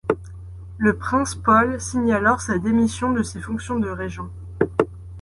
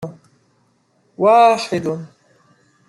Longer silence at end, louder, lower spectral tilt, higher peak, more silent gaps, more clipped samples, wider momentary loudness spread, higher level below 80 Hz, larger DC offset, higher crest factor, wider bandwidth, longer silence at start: second, 0 s vs 0.8 s; second, -21 LUFS vs -15 LUFS; about the same, -5.5 dB/octave vs -5.5 dB/octave; about the same, -2 dBFS vs -2 dBFS; neither; neither; second, 14 LU vs 18 LU; first, -40 dBFS vs -66 dBFS; neither; about the same, 20 dB vs 16 dB; about the same, 11.5 kHz vs 12 kHz; about the same, 0.05 s vs 0 s